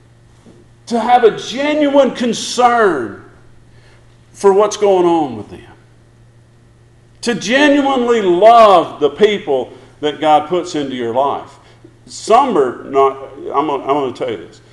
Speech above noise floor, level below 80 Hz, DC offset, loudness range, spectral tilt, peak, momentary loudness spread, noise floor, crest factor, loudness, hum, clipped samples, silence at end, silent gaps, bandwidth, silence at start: 33 dB; -52 dBFS; under 0.1%; 5 LU; -4.5 dB/octave; 0 dBFS; 13 LU; -46 dBFS; 14 dB; -13 LUFS; none; under 0.1%; 0.25 s; none; 12 kHz; 0.9 s